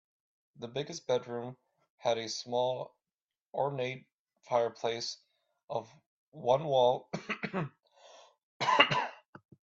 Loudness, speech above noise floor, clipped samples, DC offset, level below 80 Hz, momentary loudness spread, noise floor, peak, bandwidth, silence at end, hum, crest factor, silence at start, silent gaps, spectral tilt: -33 LUFS; over 57 dB; under 0.1%; under 0.1%; -78 dBFS; 15 LU; under -90 dBFS; -6 dBFS; 8 kHz; 0.55 s; none; 28 dB; 0.6 s; 1.90-1.98 s, 3.14-3.28 s, 3.41-3.50 s, 4.13-4.26 s, 5.64-5.68 s, 6.06-6.32 s, 8.43-8.60 s; -4 dB/octave